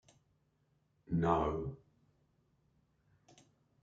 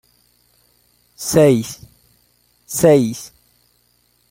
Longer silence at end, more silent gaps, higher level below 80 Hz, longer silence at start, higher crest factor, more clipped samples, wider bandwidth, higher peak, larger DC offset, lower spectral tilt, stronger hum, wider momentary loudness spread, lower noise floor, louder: first, 2.05 s vs 1.05 s; neither; second, -58 dBFS vs -52 dBFS; about the same, 1.1 s vs 1.2 s; first, 26 dB vs 20 dB; neither; second, 7.6 kHz vs 16.5 kHz; second, -16 dBFS vs 0 dBFS; neither; first, -8.5 dB/octave vs -5.5 dB/octave; second, none vs 60 Hz at -45 dBFS; second, 15 LU vs 21 LU; first, -76 dBFS vs -60 dBFS; second, -36 LUFS vs -15 LUFS